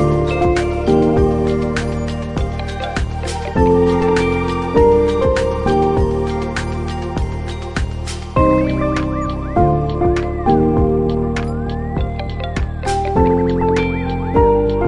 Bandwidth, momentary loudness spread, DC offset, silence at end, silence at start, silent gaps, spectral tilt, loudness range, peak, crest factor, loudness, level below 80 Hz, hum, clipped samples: 11.5 kHz; 9 LU; under 0.1%; 0 s; 0 s; none; -7.5 dB/octave; 4 LU; 0 dBFS; 16 dB; -17 LUFS; -26 dBFS; none; under 0.1%